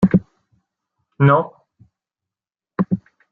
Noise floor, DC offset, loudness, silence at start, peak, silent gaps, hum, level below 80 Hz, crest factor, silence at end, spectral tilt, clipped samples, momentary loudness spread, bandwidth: -90 dBFS; under 0.1%; -18 LUFS; 0 s; -2 dBFS; none; none; -54 dBFS; 18 dB; 0.35 s; -10.5 dB/octave; under 0.1%; 15 LU; 3.9 kHz